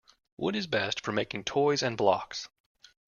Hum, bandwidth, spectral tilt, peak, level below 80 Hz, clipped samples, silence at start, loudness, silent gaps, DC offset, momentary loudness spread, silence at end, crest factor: none; 7.2 kHz; -4 dB/octave; -10 dBFS; -66 dBFS; under 0.1%; 0.4 s; -30 LUFS; none; under 0.1%; 11 LU; 0.6 s; 20 dB